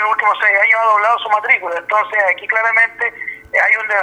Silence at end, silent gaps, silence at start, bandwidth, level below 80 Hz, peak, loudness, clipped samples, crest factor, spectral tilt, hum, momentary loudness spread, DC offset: 0 s; none; 0 s; 10 kHz; -60 dBFS; 0 dBFS; -13 LUFS; under 0.1%; 14 dB; -1.5 dB/octave; none; 7 LU; under 0.1%